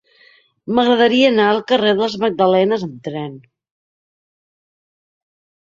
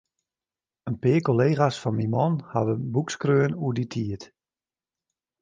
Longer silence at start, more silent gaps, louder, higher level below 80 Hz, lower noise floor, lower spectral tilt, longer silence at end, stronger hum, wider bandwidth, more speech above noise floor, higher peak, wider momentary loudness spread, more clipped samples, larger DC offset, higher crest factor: second, 0.65 s vs 0.85 s; neither; first, -16 LUFS vs -25 LUFS; about the same, -62 dBFS vs -60 dBFS; second, -52 dBFS vs under -90 dBFS; second, -6 dB/octave vs -7.5 dB/octave; first, 2.25 s vs 1.15 s; neither; second, 7.4 kHz vs 9.4 kHz; second, 37 dB vs over 66 dB; first, -2 dBFS vs -6 dBFS; first, 14 LU vs 10 LU; neither; neither; about the same, 16 dB vs 20 dB